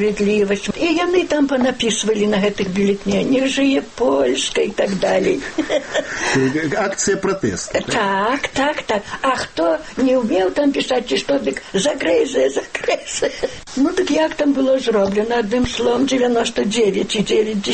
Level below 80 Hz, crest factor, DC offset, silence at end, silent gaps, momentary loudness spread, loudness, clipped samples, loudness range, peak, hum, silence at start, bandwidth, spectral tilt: -44 dBFS; 14 dB; under 0.1%; 0 s; none; 4 LU; -18 LUFS; under 0.1%; 2 LU; -4 dBFS; none; 0 s; 8.8 kHz; -4 dB/octave